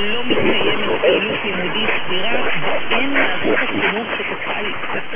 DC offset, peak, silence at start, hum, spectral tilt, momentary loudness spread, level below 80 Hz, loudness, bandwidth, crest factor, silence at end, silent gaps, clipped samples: under 0.1%; -2 dBFS; 0 s; none; -8 dB/octave; 6 LU; -50 dBFS; -18 LUFS; 3.8 kHz; 14 dB; 0 s; none; under 0.1%